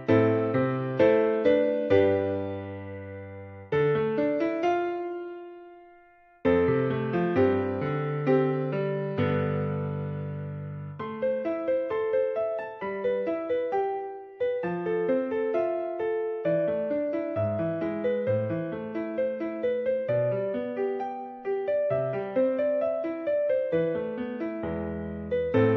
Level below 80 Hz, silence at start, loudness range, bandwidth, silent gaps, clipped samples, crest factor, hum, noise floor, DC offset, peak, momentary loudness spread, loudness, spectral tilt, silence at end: -60 dBFS; 0 s; 4 LU; 6.2 kHz; none; under 0.1%; 18 dB; none; -56 dBFS; under 0.1%; -10 dBFS; 12 LU; -28 LUFS; -7 dB/octave; 0 s